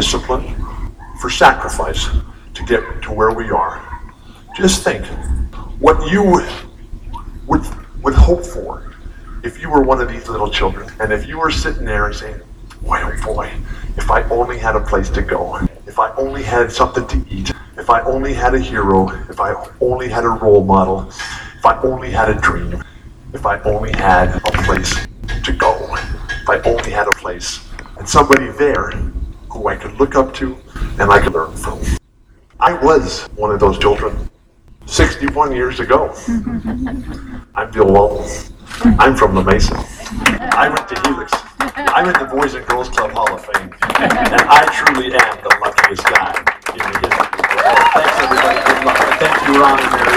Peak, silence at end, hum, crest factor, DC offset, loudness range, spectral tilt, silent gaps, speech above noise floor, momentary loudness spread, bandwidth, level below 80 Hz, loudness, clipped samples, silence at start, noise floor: 0 dBFS; 0 s; none; 14 dB; under 0.1%; 6 LU; -4.5 dB/octave; none; 34 dB; 16 LU; 20 kHz; -24 dBFS; -14 LUFS; under 0.1%; 0 s; -48 dBFS